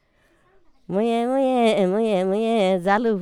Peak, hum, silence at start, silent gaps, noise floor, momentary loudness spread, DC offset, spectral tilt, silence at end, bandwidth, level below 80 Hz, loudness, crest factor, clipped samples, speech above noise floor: -4 dBFS; none; 0.9 s; none; -61 dBFS; 4 LU; under 0.1%; -6.5 dB/octave; 0 s; 11.5 kHz; -62 dBFS; -21 LUFS; 16 dB; under 0.1%; 41 dB